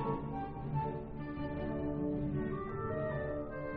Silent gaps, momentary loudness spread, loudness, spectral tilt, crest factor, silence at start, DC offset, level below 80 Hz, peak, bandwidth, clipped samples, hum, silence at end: none; 5 LU; -39 LUFS; -8 dB/octave; 14 dB; 0 s; under 0.1%; -50 dBFS; -24 dBFS; 4.9 kHz; under 0.1%; none; 0 s